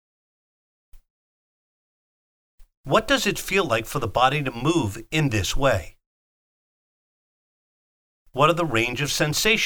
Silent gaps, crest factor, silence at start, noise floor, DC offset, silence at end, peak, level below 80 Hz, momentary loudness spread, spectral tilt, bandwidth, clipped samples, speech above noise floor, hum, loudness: 1.10-2.58 s, 2.77-2.84 s, 6.06-8.26 s; 22 dB; 0.95 s; under -90 dBFS; under 0.1%; 0 s; -4 dBFS; -42 dBFS; 5 LU; -4 dB/octave; over 20 kHz; under 0.1%; over 68 dB; none; -22 LUFS